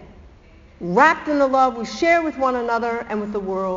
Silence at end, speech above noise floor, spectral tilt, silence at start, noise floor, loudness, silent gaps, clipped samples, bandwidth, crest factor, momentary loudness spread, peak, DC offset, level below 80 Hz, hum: 0 s; 28 dB; -3.5 dB/octave; 0 s; -47 dBFS; -19 LUFS; none; under 0.1%; 7.6 kHz; 20 dB; 10 LU; 0 dBFS; under 0.1%; -50 dBFS; none